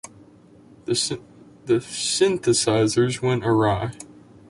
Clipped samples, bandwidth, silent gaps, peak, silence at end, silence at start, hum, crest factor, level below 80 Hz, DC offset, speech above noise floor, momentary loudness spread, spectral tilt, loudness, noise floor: under 0.1%; 11.5 kHz; none; -6 dBFS; 0.4 s; 0.05 s; none; 18 dB; -52 dBFS; under 0.1%; 29 dB; 18 LU; -4.5 dB/octave; -22 LUFS; -50 dBFS